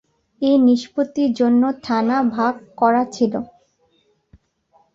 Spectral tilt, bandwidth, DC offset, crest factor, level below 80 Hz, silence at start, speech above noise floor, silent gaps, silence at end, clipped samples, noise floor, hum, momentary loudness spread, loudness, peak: -6 dB/octave; 7.6 kHz; under 0.1%; 16 dB; -62 dBFS; 0.4 s; 45 dB; none; 1.5 s; under 0.1%; -62 dBFS; none; 8 LU; -18 LUFS; -4 dBFS